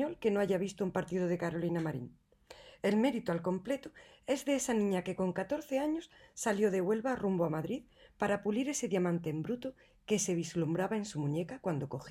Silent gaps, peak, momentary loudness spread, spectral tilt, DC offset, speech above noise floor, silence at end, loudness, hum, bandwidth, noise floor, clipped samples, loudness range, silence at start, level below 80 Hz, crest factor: none; -18 dBFS; 9 LU; -5.5 dB/octave; under 0.1%; 23 dB; 0 s; -34 LUFS; none; 15.5 kHz; -57 dBFS; under 0.1%; 2 LU; 0 s; -66 dBFS; 16 dB